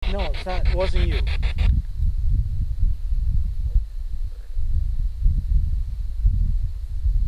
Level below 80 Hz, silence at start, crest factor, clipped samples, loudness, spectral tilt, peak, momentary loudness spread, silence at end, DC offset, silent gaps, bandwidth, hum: -22 dBFS; 0 s; 14 dB; under 0.1%; -26 LUFS; -7.5 dB/octave; -8 dBFS; 8 LU; 0 s; under 0.1%; none; 5.6 kHz; none